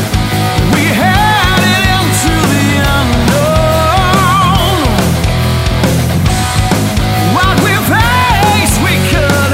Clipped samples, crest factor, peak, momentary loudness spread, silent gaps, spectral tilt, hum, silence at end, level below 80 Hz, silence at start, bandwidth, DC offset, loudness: under 0.1%; 10 dB; 0 dBFS; 3 LU; none; -4.5 dB/octave; none; 0 s; -20 dBFS; 0 s; 16.5 kHz; under 0.1%; -10 LUFS